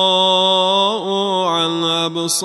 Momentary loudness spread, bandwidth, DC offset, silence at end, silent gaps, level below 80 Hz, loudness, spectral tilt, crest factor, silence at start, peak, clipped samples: 6 LU; 12.5 kHz; under 0.1%; 0 s; none; -72 dBFS; -15 LUFS; -3 dB/octave; 14 dB; 0 s; -2 dBFS; under 0.1%